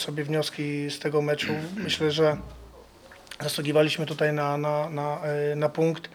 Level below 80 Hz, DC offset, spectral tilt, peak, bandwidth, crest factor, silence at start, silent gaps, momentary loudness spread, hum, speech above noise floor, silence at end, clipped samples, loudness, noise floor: -56 dBFS; under 0.1%; -5 dB/octave; -10 dBFS; 18 kHz; 18 dB; 0 s; none; 8 LU; none; 24 dB; 0.05 s; under 0.1%; -27 LUFS; -50 dBFS